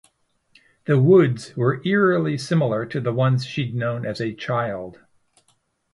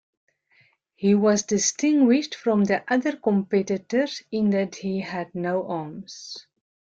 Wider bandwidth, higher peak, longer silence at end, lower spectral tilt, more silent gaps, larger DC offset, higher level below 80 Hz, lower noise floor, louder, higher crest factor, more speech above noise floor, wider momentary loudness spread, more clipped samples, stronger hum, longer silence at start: first, 11.5 kHz vs 8 kHz; first, -4 dBFS vs -8 dBFS; first, 1 s vs 0.55 s; first, -7.5 dB/octave vs -5 dB/octave; neither; neither; first, -60 dBFS vs -66 dBFS; first, -66 dBFS vs -62 dBFS; about the same, -21 LUFS vs -23 LUFS; about the same, 18 dB vs 16 dB; first, 46 dB vs 39 dB; about the same, 12 LU vs 14 LU; neither; neither; about the same, 0.9 s vs 1 s